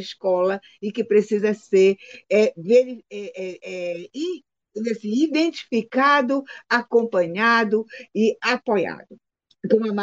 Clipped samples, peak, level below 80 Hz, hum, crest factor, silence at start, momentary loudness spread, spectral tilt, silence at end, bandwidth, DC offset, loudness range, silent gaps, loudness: under 0.1%; -4 dBFS; -74 dBFS; none; 18 dB; 0 s; 14 LU; -5.5 dB/octave; 0 s; 7.8 kHz; under 0.1%; 4 LU; none; -21 LUFS